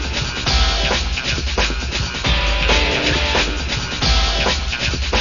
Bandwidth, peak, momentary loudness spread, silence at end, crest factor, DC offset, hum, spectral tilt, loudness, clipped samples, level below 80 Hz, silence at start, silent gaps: 7.4 kHz; -2 dBFS; 5 LU; 0 s; 16 dB; 0.6%; none; -3.5 dB/octave; -18 LUFS; under 0.1%; -22 dBFS; 0 s; none